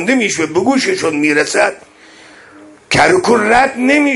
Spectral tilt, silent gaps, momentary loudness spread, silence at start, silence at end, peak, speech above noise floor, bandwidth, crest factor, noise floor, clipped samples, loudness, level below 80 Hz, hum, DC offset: -3.5 dB/octave; none; 5 LU; 0 s; 0 s; 0 dBFS; 28 dB; 11.5 kHz; 14 dB; -40 dBFS; under 0.1%; -12 LUFS; -48 dBFS; none; under 0.1%